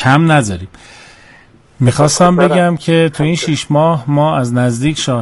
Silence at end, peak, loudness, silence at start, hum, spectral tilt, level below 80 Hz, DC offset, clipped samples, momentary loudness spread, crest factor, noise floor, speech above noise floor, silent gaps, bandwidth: 0 s; 0 dBFS; -12 LUFS; 0 s; none; -5.5 dB/octave; -42 dBFS; under 0.1%; under 0.1%; 6 LU; 12 dB; -43 dBFS; 32 dB; none; 11.5 kHz